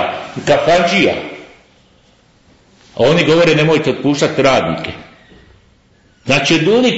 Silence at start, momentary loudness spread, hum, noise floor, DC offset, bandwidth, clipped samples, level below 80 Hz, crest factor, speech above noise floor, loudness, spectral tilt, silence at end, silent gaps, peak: 0 s; 18 LU; none; -51 dBFS; under 0.1%; 8 kHz; under 0.1%; -46 dBFS; 14 dB; 39 dB; -13 LUFS; -5 dB/octave; 0 s; none; -2 dBFS